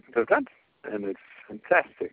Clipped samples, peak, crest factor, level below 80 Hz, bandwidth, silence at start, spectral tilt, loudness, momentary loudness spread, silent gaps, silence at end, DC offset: under 0.1%; -6 dBFS; 22 dB; -70 dBFS; 4.5 kHz; 0.15 s; -3.5 dB/octave; -26 LUFS; 20 LU; none; 0.05 s; under 0.1%